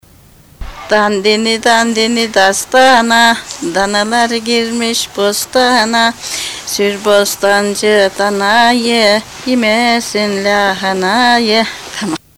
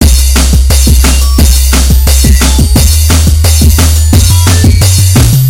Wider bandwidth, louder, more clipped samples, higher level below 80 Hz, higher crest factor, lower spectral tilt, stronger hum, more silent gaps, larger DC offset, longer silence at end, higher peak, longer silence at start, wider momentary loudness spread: about the same, 17 kHz vs 17 kHz; second, -11 LUFS vs -6 LUFS; second, under 0.1% vs 7%; second, -42 dBFS vs -8 dBFS; first, 12 dB vs 4 dB; second, -2.5 dB/octave vs -4 dB/octave; neither; neither; first, 0.3% vs under 0.1%; first, 0.2 s vs 0 s; about the same, 0 dBFS vs 0 dBFS; first, 0.6 s vs 0 s; first, 8 LU vs 1 LU